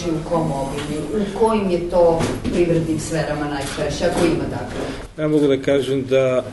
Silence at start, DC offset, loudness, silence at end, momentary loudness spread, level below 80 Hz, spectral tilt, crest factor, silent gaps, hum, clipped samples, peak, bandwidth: 0 s; under 0.1%; -20 LUFS; 0 s; 8 LU; -38 dBFS; -6 dB/octave; 16 dB; none; none; under 0.1%; -4 dBFS; 11.5 kHz